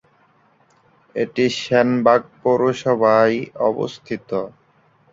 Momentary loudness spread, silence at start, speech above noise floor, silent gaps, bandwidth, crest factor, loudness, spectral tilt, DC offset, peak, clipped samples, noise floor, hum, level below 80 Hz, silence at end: 11 LU; 1.15 s; 39 dB; none; 7.8 kHz; 18 dB; -19 LUFS; -6 dB/octave; under 0.1%; -2 dBFS; under 0.1%; -57 dBFS; none; -62 dBFS; 0.65 s